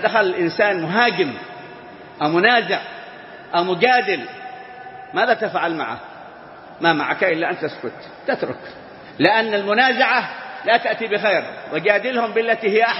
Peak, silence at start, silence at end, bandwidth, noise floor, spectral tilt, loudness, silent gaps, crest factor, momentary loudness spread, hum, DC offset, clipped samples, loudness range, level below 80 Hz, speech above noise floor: 0 dBFS; 0 s; 0 s; 6 kHz; -39 dBFS; -7.5 dB/octave; -19 LUFS; none; 20 dB; 21 LU; none; under 0.1%; under 0.1%; 4 LU; -68 dBFS; 21 dB